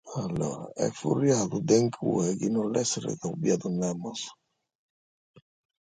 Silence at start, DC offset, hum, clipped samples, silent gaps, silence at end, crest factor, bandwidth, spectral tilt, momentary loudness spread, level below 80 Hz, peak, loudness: 0.05 s; under 0.1%; none; under 0.1%; none; 1.55 s; 20 dB; 9.6 kHz; -5.5 dB/octave; 9 LU; -64 dBFS; -10 dBFS; -28 LUFS